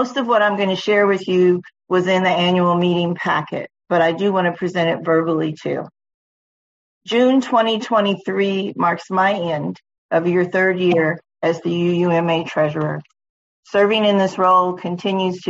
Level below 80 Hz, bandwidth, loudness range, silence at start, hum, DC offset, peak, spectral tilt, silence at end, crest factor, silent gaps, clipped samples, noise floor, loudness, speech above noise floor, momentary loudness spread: -64 dBFS; 7.8 kHz; 3 LU; 0 s; none; under 0.1%; -4 dBFS; -6.5 dB/octave; 0 s; 14 dB; 6.14-7.01 s, 9.98-10.09 s, 13.29-13.63 s; under 0.1%; under -90 dBFS; -18 LUFS; over 73 dB; 8 LU